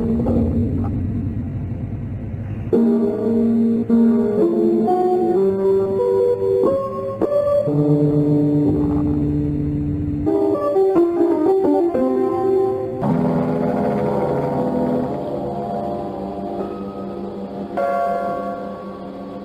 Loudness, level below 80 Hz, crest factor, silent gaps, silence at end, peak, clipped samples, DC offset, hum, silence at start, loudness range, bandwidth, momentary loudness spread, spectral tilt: -19 LUFS; -40 dBFS; 12 dB; none; 0 s; -6 dBFS; under 0.1%; under 0.1%; none; 0 s; 8 LU; 12 kHz; 11 LU; -10.5 dB/octave